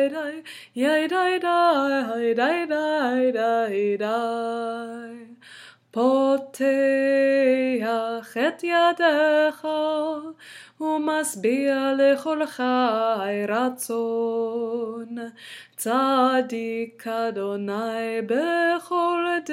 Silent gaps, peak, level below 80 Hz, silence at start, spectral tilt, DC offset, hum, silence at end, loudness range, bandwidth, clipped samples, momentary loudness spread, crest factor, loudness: none; -6 dBFS; -82 dBFS; 0 s; -4 dB/octave; under 0.1%; none; 0 s; 4 LU; 16.5 kHz; under 0.1%; 13 LU; 18 dB; -23 LUFS